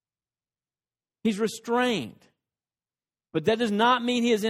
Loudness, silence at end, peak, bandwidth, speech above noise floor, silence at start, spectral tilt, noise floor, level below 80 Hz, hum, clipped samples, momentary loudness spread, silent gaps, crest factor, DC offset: -25 LUFS; 0 s; -8 dBFS; 16 kHz; over 65 dB; 1.25 s; -4.5 dB/octave; under -90 dBFS; -68 dBFS; none; under 0.1%; 9 LU; none; 20 dB; under 0.1%